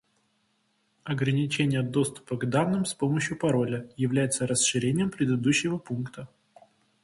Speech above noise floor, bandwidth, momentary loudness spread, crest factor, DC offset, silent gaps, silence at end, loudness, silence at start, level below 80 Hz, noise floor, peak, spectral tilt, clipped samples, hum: 45 dB; 11.5 kHz; 10 LU; 18 dB; under 0.1%; none; 0.8 s; -27 LUFS; 1.05 s; -62 dBFS; -71 dBFS; -10 dBFS; -5 dB/octave; under 0.1%; none